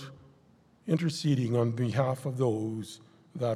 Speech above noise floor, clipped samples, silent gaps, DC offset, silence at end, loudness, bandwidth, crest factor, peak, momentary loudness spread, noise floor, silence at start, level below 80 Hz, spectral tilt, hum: 33 dB; under 0.1%; none; under 0.1%; 0 s; -30 LUFS; 13.5 kHz; 18 dB; -12 dBFS; 18 LU; -62 dBFS; 0 s; -70 dBFS; -7 dB/octave; none